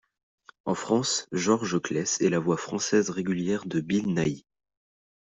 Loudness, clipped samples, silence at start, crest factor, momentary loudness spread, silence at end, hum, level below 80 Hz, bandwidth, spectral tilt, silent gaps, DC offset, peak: -27 LUFS; under 0.1%; 0.65 s; 18 dB; 6 LU; 0.9 s; none; -64 dBFS; 8.2 kHz; -4.5 dB/octave; none; under 0.1%; -10 dBFS